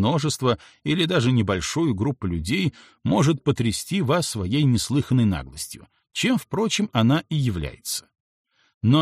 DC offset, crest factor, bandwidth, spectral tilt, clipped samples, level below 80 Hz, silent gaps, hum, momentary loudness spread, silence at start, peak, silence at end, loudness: under 0.1%; 16 dB; 15 kHz; -5.5 dB/octave; under 0.1%; -46 dBFS; 8.20-8.45 s, 8.74-8.81 s; none; 9 LU; 0 s; -6 dBFS; 0 s; -23 LUFS